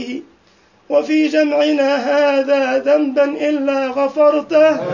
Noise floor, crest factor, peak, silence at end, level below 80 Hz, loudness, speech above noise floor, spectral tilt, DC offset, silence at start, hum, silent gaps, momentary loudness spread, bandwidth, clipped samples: -53 dBFS; 14 dB; -2 dBFS; 0 s; -64 dBFS; -15 LUFS; 38 dB; -5 dB/octave; under 0.1%; 0 s; none; none; 5 LU; 7.4 kHz; under 0.1%